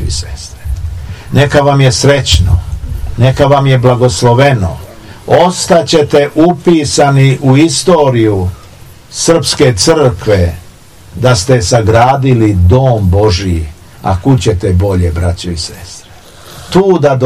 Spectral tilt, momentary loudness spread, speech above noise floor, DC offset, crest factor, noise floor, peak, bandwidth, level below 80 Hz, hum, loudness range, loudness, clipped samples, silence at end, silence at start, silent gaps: -5.5 dB/octave; 14 LU; 28 dB; 0.6%; 10 dB; -36 dBFS; 0 dBFS; 14 kHz; -24 dBFS; none; 3 LU; -9 LUFS; 3%; 0 s; 0 s; none